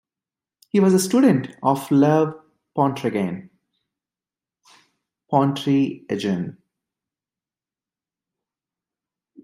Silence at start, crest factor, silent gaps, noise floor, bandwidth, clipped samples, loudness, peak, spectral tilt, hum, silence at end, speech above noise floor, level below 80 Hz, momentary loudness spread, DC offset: 0.75 s; 20 dB; none; under -90 dBFS; 15.5 kHz; under 0.1%; -20 LUFS; -4 dBFS; -6.5 dB/octave; none; 2.95 s; over 71 dB; -68 dBFS; 10 LU; under 0.1%